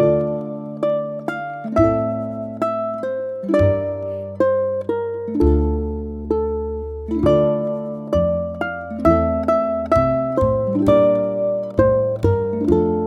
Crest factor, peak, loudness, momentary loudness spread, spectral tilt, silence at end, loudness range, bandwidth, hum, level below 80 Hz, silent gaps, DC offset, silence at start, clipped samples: 18 dB; -2 dBFS; -20 LUFS; 10 LU; -9.5 dB/octave; 0 s; 4 LU; 9.2 kHz; none; -32 dBFS; none; under 0.1%; 0 s; under 0.1%